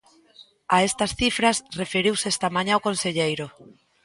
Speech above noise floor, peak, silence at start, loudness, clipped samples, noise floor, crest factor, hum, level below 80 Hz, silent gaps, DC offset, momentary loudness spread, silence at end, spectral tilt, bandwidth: 30 dB; -4 dBFS; 0.4 s; -23 LUFS; under 0.1%; -53 dBFS; 20 dB; none; -52 dBFS; none; under 0.1%; 7 LU; 0.35 s; -3 dB/octave; 11.5 kHz